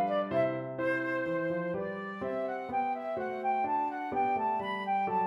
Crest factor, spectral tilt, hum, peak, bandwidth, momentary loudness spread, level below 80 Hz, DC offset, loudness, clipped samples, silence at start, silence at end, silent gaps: 14 dB; -7.5 dB/octave; none; -16 dBFS; 11.5 kHz; 5 LU; -70 dBFS; under 0.1%; -32 LUFS; under 0.1%; 0 s; 0 s; none